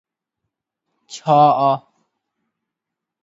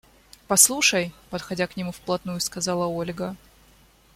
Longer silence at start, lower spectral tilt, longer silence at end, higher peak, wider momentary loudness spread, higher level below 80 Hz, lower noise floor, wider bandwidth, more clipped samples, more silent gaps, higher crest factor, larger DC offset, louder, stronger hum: first, 1.1 s vs 0.5 s; first, -6.5 dB/octave vs -2 dB/octave; first, 1.45 s vs 0.8 s; about the same, 0 dBFS vs 0 dBFS; about the same, 16 LU vs 16 LU; second, -76 dBFS vs -56 dBFS; first, -83 dBFS vs -56 dBFS; second, 7.8 kHz vs 16.5 kHz; neither; neither; second, 20 dB vs 26 dB; neither; first, -15 LUFS vs -22 LUFS; neither